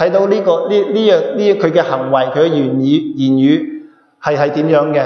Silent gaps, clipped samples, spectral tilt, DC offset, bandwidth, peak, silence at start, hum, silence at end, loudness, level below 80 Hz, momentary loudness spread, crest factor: none; under 0.1%; -7.5 dB/octave; under 0.1%; 6.6 kHz; 0 dBFS; 0 s; none; 0 s; -13 LUFS; -62 dBFS; 4 LU; 12 dB